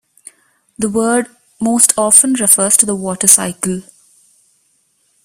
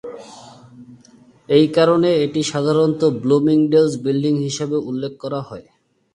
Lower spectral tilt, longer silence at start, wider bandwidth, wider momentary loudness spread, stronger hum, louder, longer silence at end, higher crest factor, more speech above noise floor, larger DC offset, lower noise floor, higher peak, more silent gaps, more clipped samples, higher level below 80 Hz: second, -2.5 dB/octave vs -6 dB/octave; first, 0.8 s vs 0.05 s; first, over 20 kHz vs 11 kHz; about the same, 13 LU vs 13 LU; neither; first, -11 LUFS vs -17 LUFS; first, 1.45 s vs 0.55 s; about the same, 16 dB vs 18 dB; first, 47 dB vs 32 dB; neither; first, -59 dBFS vs -49 dBFS; about the same, 0 dBFS vs -2 dBFS; neither; first, 0.3% vs under 0.1%; about the same, -56 dBFS vs -60 dBFS